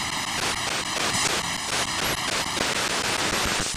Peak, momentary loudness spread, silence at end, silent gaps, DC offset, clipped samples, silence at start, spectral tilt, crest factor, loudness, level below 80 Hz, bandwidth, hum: -8 dBFS; 3 LU; 0 s; none; under 0.1%; under 0.1%; 0 s; -1.5 dB/octave; 18 dB; -24 LUFS; -46 dBFS; 14.5 kHz; none